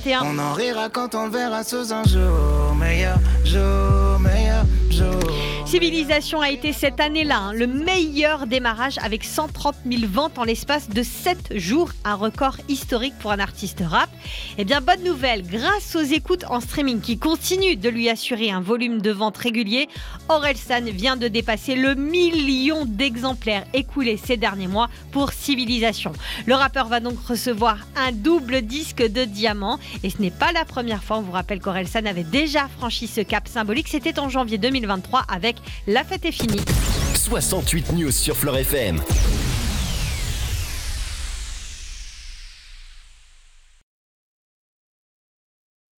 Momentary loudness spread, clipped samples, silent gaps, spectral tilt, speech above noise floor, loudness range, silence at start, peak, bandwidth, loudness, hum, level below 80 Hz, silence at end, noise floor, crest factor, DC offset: 7 LU; under 0.1%; none; -4.5 dB/octave; 29 dB; 4 LU; 0 s; -6 dBFS; 19 kHz; -21 LUFS; none; -28 dBFS; 2.95 s; -50 dBFS; 16 dB; under 0.1%